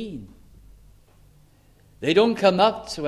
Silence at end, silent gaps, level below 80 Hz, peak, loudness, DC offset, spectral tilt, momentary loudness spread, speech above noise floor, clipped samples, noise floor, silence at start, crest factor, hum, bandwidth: 0 s; none; -54 dBFS; -6 dBFS; -20 LUFS; under 0.1%; -5 dB/octave; 17 LU; 34 dB; under 0.1%; -55 dBFS; 0 s; 20 dB; none; 12.5 kHz